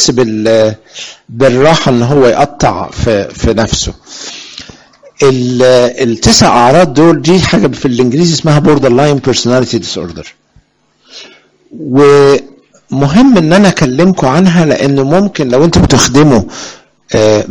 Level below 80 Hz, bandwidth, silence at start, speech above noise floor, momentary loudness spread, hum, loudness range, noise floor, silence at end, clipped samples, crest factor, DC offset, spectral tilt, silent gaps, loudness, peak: -30 dBFS; 18.5 kHz; 0 s; 44 dB; 17 LU; none; 5 LU; -51 dBFS; 0 s; 0.2%; 8 dB; 0.5%; -5 dB/octave; none; -8 LUFS; 0 dBFS